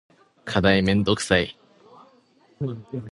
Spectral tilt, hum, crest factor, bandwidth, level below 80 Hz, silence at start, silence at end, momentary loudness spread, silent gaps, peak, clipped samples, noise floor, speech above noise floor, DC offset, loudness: -5 dB/octave; none; 22 dB; 11.5 kHz; -46 dBFS; 0.45 s; 0 s; 14 LU; none; -2 dBFS; under 0.1%; -59 dBFS; 37 dB; under 0.1%; -22 LUFS